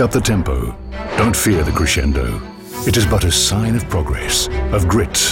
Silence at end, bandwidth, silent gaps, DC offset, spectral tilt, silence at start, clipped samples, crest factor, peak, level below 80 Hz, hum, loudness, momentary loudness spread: 0 s; 16.5 kHz; none; under 0.1%; -4 dB/octave; 0 s; under 0.1%; 12 dB; -4 dBFS; -24 dBFS; none; -16 LUFS; 9 LU